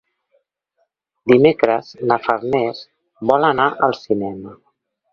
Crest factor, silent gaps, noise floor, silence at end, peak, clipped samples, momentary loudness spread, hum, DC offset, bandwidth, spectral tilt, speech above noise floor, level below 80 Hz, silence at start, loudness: 18 dB; none; -69 dBFS; 0.6 s; 0 dBFS; under 0.1%; 15 LU; none; under 0.1%; 6.8 kHz; -7.5 dB/octave; 52 dB; -58 dBFS; 1.25 s; -17 LUFS